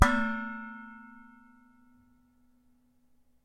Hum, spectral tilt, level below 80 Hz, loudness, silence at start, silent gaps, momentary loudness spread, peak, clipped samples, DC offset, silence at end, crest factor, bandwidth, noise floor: 60 Hz at -85 dBFS; -5.5 dB/octave; -44 dBFS; -32 LUFS; 0 s; none; 26 LU; -4 dBFS; under 0.1%; under 0.1%; 2.25 s; 30 dB; 15.5 kHz; -66 dBFS